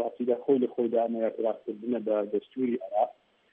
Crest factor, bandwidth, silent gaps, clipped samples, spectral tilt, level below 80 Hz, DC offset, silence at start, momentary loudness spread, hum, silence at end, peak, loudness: 16 dB; 3.8 kHz; none; under 0.1%; -10 dB/octave; -84 dBFS; under 0.1%; 0 s; 6 LU; none; 0.4 s; -12 dBFS; -29 LUFS